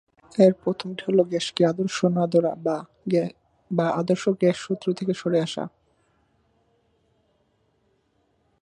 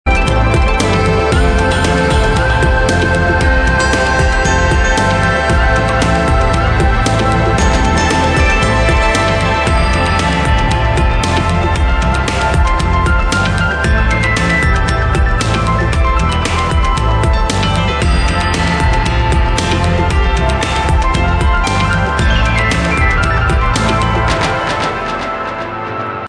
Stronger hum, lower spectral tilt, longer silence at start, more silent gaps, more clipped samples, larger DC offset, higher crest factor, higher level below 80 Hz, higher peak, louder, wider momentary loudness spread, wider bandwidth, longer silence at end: neither; first, -6.5 dB/octave vs -5 dB/octave; first, 0.35 s vs 0.05 s; neither; neither; neither; first, 20 dB vs 10 dB; second, -68 dBFS vs -16 dBFS; second, -4 dBFS vs 0 dBFS; second, -24 LUFS vs -13 LUFS; first, 11 LU vs 2 LU; about the same, 11 kHz vs 10 kHz; first, 2.95 s vs 0 s